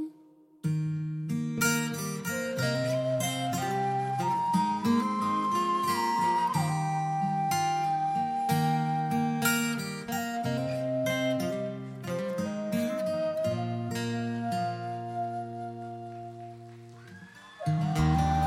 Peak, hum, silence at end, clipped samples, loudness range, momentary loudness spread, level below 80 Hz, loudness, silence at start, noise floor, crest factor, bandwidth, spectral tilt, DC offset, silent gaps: -12 dBFS; none; 0 s; under 0.1%; 7 LU; 12 LU; -52 dBFS; -30 LUFS; 0 s; -57 dBFS; 16 dB; 16.5 kHz; -5.5 dB/octave; under 0.1%; none